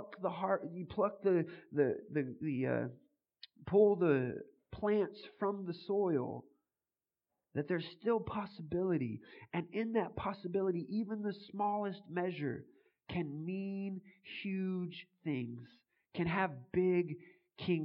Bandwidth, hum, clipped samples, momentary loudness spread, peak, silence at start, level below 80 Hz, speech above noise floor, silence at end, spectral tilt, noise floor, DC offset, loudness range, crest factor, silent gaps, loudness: 5.4 kHz; none; under 0.1%; 11 LU; -18 dBFS; 0 s; -70 dBFS; over 54 dB; 0 s; -10.5 dB/octave; under -90 dBFS; under 0.1%; 6 LU; 20 dB; none; -37 LUFS